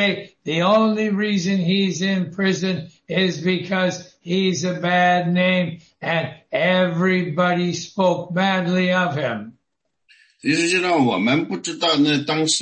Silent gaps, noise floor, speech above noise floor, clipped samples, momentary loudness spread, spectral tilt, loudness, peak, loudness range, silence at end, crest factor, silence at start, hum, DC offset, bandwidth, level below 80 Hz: none; -76 dBFS; 57 dB; under 0.1%; 8 LU; -5 dB/octave; -20 LUFS; -4 dBFS; 2 LU; 0 s; 16 dB; 0 s; none; under 0.1%; 8.8 kHz; -64 dBFS